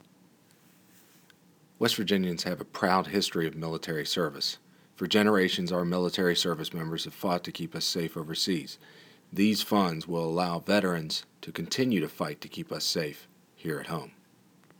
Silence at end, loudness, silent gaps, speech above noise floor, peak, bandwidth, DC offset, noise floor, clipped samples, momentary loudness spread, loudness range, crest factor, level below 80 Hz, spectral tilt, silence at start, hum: 0.7 s; -29 LUFS; none; 32 dB; -8 dBFS; over 20 kHz; under 0.1%; -61 dBFS; under 0.1%; 12 LU; 3 LU; 22 dB; -68 dBFS; -4.5 dB/octave; 1.8 s; none